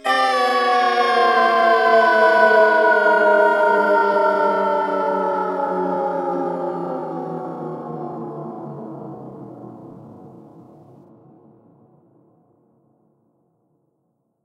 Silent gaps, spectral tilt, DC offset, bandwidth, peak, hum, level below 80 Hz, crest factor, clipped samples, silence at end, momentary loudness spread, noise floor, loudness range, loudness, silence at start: none; -5 dB/octave; under 0.1%; 12 kHz; -2 dBFS; none; -78 dBFS; 18 dB; under 0.1%; 4.15 s; 20 LU; -70 dBFS; 20 LU; -17 LUFS; 0.05 s